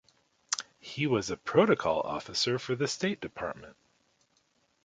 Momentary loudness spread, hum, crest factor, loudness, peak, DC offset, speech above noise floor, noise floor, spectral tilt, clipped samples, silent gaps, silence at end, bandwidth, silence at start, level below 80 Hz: 13 LU; none; 22 dB; -30 LUFS; -10 dBFS; under 0.1%; 42 dB; -72 dBFS; -4 dB/octave; under 0.1%; none; 1.1 s; 9.6 kHz; 0.5 s; -64 dBFS